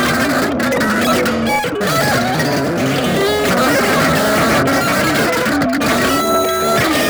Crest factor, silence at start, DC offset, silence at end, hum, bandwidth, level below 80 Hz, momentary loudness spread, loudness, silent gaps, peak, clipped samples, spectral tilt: 12 dB; 0 s; under 0.1%; 0 s; none; over 20 kHz; -40 dBFS; 3 LU; -14 LUFS; none; -2 dBFS; under 0.1%; -4 dB/octave